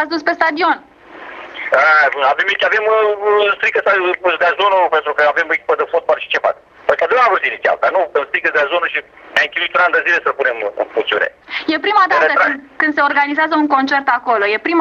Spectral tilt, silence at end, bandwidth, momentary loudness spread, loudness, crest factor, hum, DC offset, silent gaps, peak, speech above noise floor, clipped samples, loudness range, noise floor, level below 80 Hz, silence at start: -3.5 dB/octave; 0 s; 7.6 kHz; 7 LU; -14 LUFS; 14 dB; none; under 0.1%; none; 0 dBFS; 20 dB; under 0.1%; 2 LU; -34 dBFS; -62 dBFS; 0 s